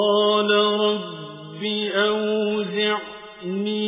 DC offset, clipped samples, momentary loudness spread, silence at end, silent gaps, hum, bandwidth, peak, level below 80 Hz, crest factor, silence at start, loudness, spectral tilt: under 0.1%; under 0.1%; 16 LU; 0 s; none; none; 3.9 kHz; -6 dBFS; -70 dBFS; 16 dB; 0 s; -21 LUFS; -9 dB/octave